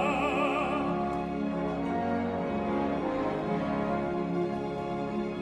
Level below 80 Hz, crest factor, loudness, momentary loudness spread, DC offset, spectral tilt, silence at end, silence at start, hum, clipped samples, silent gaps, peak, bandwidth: -52 dBFS; 14 dB; -31 LUFS; 5 LU; under 0.1%; -7.5 dB/octave; 0 s; 0 s; none; under 0.1%; none; -16 dBFS; 10.5 kHz